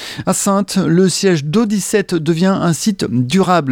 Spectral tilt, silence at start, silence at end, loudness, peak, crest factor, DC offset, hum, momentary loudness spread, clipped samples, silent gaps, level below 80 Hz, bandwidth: -5 dB/octave; 0 s; 0 s; -15 LUFS; -2 dBFS; 12 dB; under 0.1%; none; 4 LU; under 0.1%; none; -50 dBFS; 17 kHz